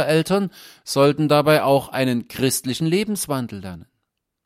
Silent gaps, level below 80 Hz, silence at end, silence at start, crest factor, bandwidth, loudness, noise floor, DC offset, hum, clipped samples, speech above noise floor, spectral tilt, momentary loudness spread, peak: none; -58 dBFS; 0.65 s; 0 s; 18 dB; 16 kHz; -20 LUFS; -77 dBFS; under 0.1%; none; under 0.1%; 57 dB; -5 dB/octave; 14 LU; -2 dBFS